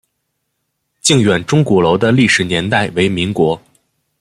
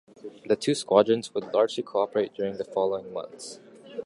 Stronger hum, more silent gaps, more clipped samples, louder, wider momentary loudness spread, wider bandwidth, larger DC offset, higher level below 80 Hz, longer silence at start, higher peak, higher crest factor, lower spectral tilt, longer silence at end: neither; neither; neither; first, -13 LUFS vs -26 LUFS; second, 5 LU vs 20 LU; first, 14 kHz vs 11.5 kHz; neither; first, -48 dBFS vs -70 dBFS; first, 1.05 s vs 0.25 s; first, 0 dBFS vs -4 dBFS; second, 14 dB vs 22 dB; about the same, -4.5 dB/octave vs -5 dB/octave; first, 0.6 s vs 0 s